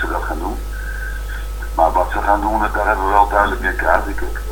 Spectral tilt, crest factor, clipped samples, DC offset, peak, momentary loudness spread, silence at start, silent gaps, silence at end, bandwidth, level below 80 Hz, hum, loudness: -5.5 dB/octave; 18 dB; under 0.1%; under 0.1%; 0 dBFS; 12 LU; 0 s; none; 0 s; 19 kHz; -24 dBFS; none; -18 LUFS